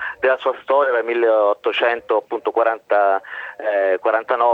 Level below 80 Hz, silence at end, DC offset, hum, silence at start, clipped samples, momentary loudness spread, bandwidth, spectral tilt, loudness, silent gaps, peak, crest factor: -68 dBFS; 0 s; under 0.1%; none; 0 s; under 0.1%; 5 LU; 4.9 kHz; -4.5 dB/octave; -19 LUFS; none; -4 dBFS; 14 dB